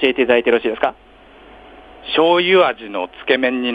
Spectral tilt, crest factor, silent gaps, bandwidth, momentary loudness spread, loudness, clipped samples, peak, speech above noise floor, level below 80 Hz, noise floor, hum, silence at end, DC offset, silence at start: -6 dB/octave; 16 dB; none; 5 kHz; 12 LU; -16 LUFS; under 0.1%; -2 dBFS; 27 dB; -52 dBFS; -43 dBFS; none; 0 s; under 0.1%; 0 s